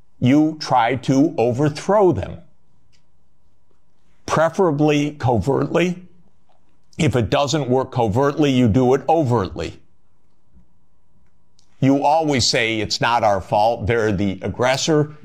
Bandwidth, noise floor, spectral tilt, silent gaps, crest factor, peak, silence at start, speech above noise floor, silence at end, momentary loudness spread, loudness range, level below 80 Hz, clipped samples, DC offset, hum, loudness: 14.5 kHz; -64 dBFS; -5.5 dB/octave; none; 14 dB; -6 dBFS; 0.2 s; 47 dB; 0.1 s; 6 LU; 4 LU; -46 dBFS; under 0.1%; 0.6%; none; -18 LUFS